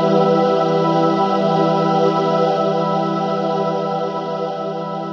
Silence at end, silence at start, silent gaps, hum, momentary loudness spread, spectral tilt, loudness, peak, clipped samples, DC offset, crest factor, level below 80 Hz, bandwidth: 0 s; 0 s; none; none; 8 LU; -7.5 dB/octave; -18 LUFS; -2 dBFS; under 0.1%; under 0.1%; 14 dB; -76 dBFS; 7.2 kHz